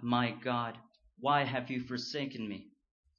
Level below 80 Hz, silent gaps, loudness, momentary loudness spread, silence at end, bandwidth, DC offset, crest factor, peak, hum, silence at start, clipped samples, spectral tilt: -72 dBFS; none; -35 LUFS; 12 LU; 0.55 s; 7 kHz; under 0.1%; 20 dB; -16 dBFS; none; 0 s; under 0.1%; -3.5 dB/octave